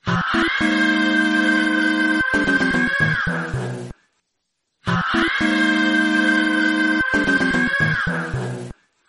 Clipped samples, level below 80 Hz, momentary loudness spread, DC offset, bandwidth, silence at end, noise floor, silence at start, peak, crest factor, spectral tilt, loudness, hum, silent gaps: under 0.1%; -44 dBFS; 10 LU; under 0.1%; 11.5 kHz; 0.35 s; -75 dBFS; 0.05 s; -6 dBFS; 14 dB; -5 dB/octave; -18 LUFS; none; none